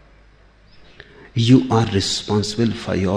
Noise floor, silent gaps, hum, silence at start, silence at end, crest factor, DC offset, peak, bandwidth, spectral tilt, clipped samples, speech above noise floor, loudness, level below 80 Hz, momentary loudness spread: -50 dBFS; none; none; 1.35 s; 0 s; 18 dB; under 0.1%; -2 dBFS; 10 kHz; -5.5 dB/octave; under 0.1%; 33 dB; -18 LUFS; -48 dBFS; 7 LU